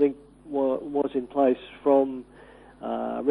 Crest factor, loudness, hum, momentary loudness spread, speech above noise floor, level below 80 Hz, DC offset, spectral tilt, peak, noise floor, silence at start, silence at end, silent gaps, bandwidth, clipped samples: 16 dB; -26 LUFS; none; 13 LU; 24 dB; -60 dBFS; under 0.1%; -8 dB/octave; -10 dBFS; -48 dBFS; 0 s; 0 s; none; 4.1 kHz; under 0.1%